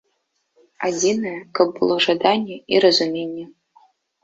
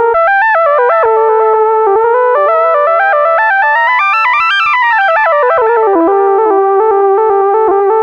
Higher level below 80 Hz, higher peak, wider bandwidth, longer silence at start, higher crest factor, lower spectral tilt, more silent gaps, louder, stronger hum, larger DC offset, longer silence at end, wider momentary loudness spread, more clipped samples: second, -64 dBFS vs -54 dBFS; about the same, -2 dBFS vs 0 dBFS; first, 7.8 kHz vs 6.8 kHz; first, 0.8 s vs 0 s; first, 20 dB vs 8 dB; about the same, -3.5 dB/octave vs -4 dB/octave; neither; second, -19 LUFS vs -9 LUFS; neither; neither; first, 0.75 s vs 0 s; first, 12 LU vs 1 LU; neither